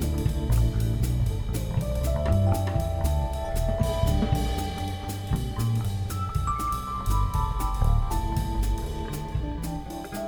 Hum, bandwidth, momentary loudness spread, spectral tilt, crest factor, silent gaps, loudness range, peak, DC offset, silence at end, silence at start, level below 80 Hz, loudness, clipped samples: none; over 20 kHz; 7 LU; -6.5 dB/octave; 16 dB; none; 2 LU; -10 dBFS; under 0.1%; 0 s; 0 s; -28 dBFS; -28 LUFS; under 0.1%